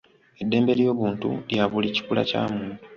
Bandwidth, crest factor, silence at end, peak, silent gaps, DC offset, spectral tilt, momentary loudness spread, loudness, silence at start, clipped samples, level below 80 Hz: 7.2 kHz; 18 dB; 0 s; -6 dBFS; none; under 0.1%; -7 dB/octave; 8 LU; -24 LUFS; 0.4 s; under 0.1%; -58 dBFS